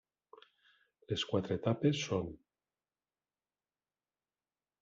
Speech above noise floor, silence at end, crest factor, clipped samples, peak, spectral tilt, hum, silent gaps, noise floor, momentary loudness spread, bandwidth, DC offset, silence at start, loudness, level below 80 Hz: over 56 dB; 2.45 s; 22 dB; under 0.1%; -18 dBFS; -5.5 dB/octave; none; none; under -90 dBFS; 11 LU; 7.8 kHz; under 0.1%; 1.1 s; -35 LUFS; -70 dBFS